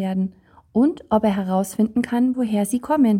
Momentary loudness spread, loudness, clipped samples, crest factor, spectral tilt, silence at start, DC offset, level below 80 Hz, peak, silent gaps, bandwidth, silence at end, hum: 6 LU; -21 LUFS; under 0.1%; 14 dB; -7 dB/octave; 0 s; under 0.1%; -56 dBFS; -6 dBFS; none; 16.5 kHz; 0 s; none